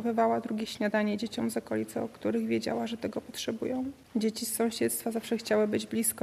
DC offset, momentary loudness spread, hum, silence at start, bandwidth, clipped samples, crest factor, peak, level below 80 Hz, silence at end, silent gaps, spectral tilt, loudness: under 0.1%; 7 LU; none; 0 s; 14.5 kHz; under 0.1%; 16 dB; -14 dBFS; -68 dBFS; 0 s; none; -4 dB/octave; -31 LUFS